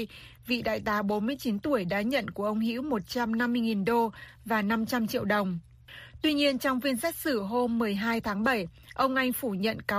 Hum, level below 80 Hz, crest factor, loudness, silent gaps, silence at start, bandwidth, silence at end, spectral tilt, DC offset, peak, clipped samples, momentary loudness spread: none; -58 dBFS; 16 dB; -29 LUFS; none; 0 s; 15.5 kHz; 0 s; -5 dB/octave; under 0.1%; -14 dBFS; under 0.1%; 6 LU